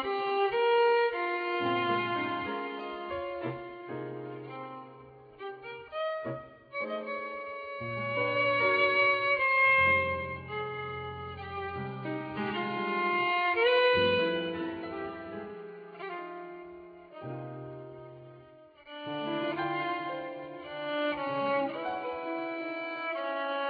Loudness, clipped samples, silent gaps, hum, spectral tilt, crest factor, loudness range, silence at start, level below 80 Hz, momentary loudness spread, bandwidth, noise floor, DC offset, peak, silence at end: -30 LUFS; under 0.1%; none; none; -7.5 dB/octave; 18 dB; 14 LU; 0 s; -64 dBFS; 19 LU; 5 kHz; -55 dBFS; under 0.1%; -14 dBFS; 0 s